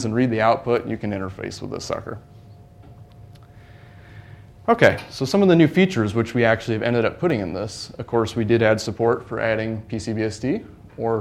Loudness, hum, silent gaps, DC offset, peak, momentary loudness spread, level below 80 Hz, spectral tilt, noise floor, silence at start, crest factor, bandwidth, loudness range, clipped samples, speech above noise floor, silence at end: -21 LUFS; none; none; under 0.1%; 0 dBFS; 14 LU; -50 dBFS; -6.5 dB/octave; -45 dBFS; 0 s; 22 dB; 13.5 kHz; 13 LU; under 0.1%; 24 dB; 0 s